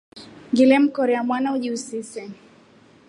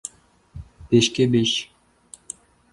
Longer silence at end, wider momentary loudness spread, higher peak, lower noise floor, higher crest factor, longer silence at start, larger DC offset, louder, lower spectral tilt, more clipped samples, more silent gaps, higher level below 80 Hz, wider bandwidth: second, 0.75 s vs 1.1 s; second, 20 LU vs 24 LU; about the same, -4 dBFS vs -4 dBFS; about the same, -52 dBFS vs -53 dBFS; about the same, 18 dB vs 20 dB; second, 0.15 s vs 0.55 s; neither; about the same, -20 LUFS vs -20 LUFS; about the same, -4.5 dB/octave vs -4.5 dB/octave; neither; neither; second, -72 dBFS vs -50 dBFS; about the same, 11 kHz vs 11.5 kHz